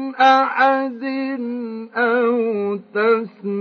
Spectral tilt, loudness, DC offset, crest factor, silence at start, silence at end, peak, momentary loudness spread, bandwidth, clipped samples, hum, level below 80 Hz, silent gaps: -6 dB/octave; -19 LUFS; under 0.1%; 16 dB; 0 s; 0 s; -4 dBFS; 12 LU; 6.6 kHz; under 0.1%; none; -82 dBFS; none